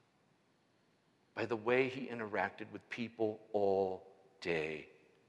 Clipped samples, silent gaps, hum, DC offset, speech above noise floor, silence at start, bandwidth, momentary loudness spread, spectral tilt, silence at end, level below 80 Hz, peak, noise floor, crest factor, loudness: under 0.1%; none; none; under 0.1%; 36 dB; 1.35 s; 8.8 kHz; 13 LU; -6.5 dB/octave; 0.4 s; -78 dBFS; -18 dBFS; -74 dBFS; 20 dB; -38 LUFS